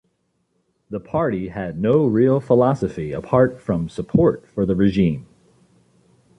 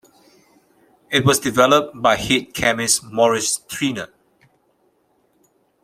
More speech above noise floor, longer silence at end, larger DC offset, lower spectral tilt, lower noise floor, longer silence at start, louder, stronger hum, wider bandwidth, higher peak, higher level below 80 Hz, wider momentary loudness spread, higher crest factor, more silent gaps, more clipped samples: first, 50 dB vs 45 dB; second, 1.15 s vs 1.8 s; neither; first, -9 dB/octave vs -3 dB/octave; first, -69 dBFS vs -63 dBFS; second, 0.9 s vs 1.1 s; about the same, -19 LUFS vs -18 LUFS; neither; second, 9.6 kHz vs 16 kHz; second, -4 dBFS vs 0 dBFS; first, -46 dBFS vs -52 dBFS; first, 11 LU vs 8 LU; about the same, 18 dB vs 20 dB; neither; neither